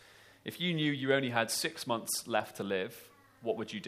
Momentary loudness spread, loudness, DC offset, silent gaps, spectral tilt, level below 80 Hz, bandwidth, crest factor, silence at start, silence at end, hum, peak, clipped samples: 13 LU; -33 LUFS; under 0.1%; none; -3.5 dB/octave; -78 dBFS; 15.5 kHz; 22 dB; 0.45 s; 0 s; none; -12 dBFS; under 0.1%